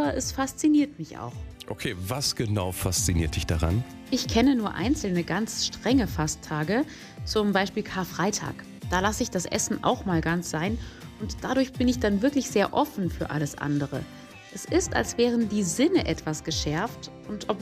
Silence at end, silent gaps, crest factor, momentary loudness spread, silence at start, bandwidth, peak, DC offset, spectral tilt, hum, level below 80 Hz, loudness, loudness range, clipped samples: 0 s; none; 18 dB; 13 LU; 0 s; 15.5 kHz; -10 dBFS; under 0.1%; -4.5 dB/octave; none; -44 dBFS; -26 LUFS; 2 LU; under 0.1%